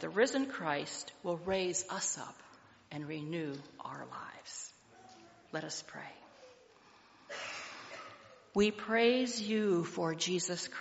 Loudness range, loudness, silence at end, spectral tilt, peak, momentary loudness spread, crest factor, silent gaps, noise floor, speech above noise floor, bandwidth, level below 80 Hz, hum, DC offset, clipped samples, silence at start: 13 LU; -36 LUFS; 0 s; -3.5 dB/octave; -16 dBFS; 17 LU; 20 dB; none; -62 dBFS; 27 dB; 8 kHz; -72 dBFS; none; under 0.1%; under 0.1%; 0 s